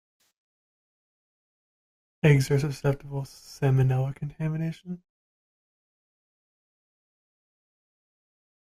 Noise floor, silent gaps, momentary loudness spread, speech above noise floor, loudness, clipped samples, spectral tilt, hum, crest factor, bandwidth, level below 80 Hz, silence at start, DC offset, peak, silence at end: under -90 dBFS; none; 18 LU; over 65 dB; -26 LUFS; under 0.1%; -7 dB/octave; none; 24 dB; 14.5 kHz; -56 dBFS; 2.25 s; under 0.1%; -6 dBFS; 3.75 s